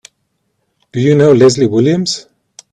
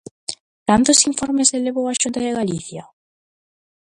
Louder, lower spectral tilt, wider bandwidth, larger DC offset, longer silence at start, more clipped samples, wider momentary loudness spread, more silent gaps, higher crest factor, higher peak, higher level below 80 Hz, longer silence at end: first, -11 LUFS vs -17 LUFS; first, -6 dB/octave vs -2.5 dB/octave; about the same, 10.5 kHz vs 11.5 kHz; neither; first, 0.95 s vs 0.3 s; neither; second, 13 LU vs 18 LU; second, none vs 0.40-0.66 s; second, 12 dB vs 20 dB; about the same, 0 dBFS vs 0 dBFS; about the same, -52 dBFS vs -52 dBFS; second, 0.5 s vs 1 s